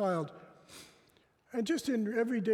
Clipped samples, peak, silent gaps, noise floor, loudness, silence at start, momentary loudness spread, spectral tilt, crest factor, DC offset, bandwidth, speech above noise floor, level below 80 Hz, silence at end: under 0.1%; -20 dBFS; none; -68 dBFS; -34 LUFS; 0 s; 21 LU; -5.5 dB/octave; 14 dB; under 0.1%; 16 kHz; 36 dB; -76 dBFS; 0 s